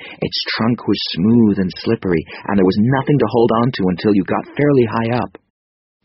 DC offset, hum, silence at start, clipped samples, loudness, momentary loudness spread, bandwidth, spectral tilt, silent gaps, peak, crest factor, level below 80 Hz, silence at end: under 0.1%; none; 0 s; under 0.1%; -16 LUFS; 7 LU; 6 kHz; -5.5 dB/octave; none; -2 dBFS; 14 dB; -48 dBFS; 0.8 s